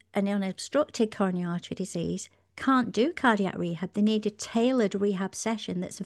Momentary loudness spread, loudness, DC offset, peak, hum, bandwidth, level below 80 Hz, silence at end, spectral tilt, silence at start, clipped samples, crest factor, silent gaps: 9 LU; -28 LUFS; under 0.1%; -10 dBFS; none; 12.5 kHz; -66 dBFS; 0 s; -5.5 dB/octave; 0.15 s; under 0.1%; 18 dB; none